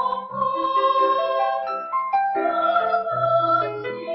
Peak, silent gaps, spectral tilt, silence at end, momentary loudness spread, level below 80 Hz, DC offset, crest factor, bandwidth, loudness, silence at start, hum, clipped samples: -8 dBFS; none; -8 dB/octave; 0 s; 7 LU; -68 dBFS; under 0.1%; 14 dB; 5.8 kHz; -21 LUFS; 0 s; none; under 0.1%